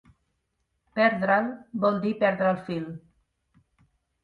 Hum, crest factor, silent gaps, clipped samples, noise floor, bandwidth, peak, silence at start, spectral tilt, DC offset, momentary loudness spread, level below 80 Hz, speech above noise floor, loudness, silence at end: none; 20 dB; none; under 0.1%; -77 dBFS; 5.4 kHz; -8 dBFS; 0.95 s; -8.5 dB/octave; under 0.1%; 12 LU; -66 dBFS; 52 dB; -25 LUFS; 1.25 s